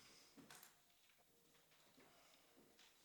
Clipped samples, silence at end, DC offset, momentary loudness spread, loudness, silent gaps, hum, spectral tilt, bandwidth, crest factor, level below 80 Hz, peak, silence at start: under 0.1%; 0 s; under 0.1%; 7 LU; -66 LUFS; none; none; -2 dB/octave; over 20 kHz; 24 dB; under -90 dBFS; -46 dBFS; 0 s